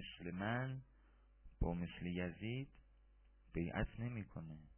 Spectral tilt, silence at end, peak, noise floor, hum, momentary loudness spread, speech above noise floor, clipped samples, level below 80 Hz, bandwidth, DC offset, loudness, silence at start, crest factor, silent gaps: -6 dB/octave; 0.05 s; -26 dBFS; -68 dBFS; none; 9 LU; 24 dB; under 0.1%; -54 dBFS; 3.3 kHz; under 0.1%; -45 LUFS; 0 s; 18 dB; none